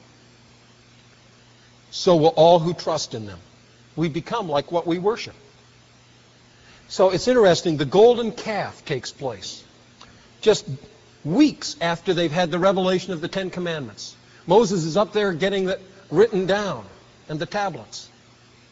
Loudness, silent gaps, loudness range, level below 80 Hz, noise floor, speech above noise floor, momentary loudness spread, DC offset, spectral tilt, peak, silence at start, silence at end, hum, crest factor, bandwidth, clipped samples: -21 LUFS; none; 6 LU; -56 dBFS; -52 dBFS; 32 dB; 18 LU; under 0.1%; -4.5 dB/octave; -4 dBFS; 1.95 s; 0.65 s; none; 18 dB; 8 kHz; under 0.1%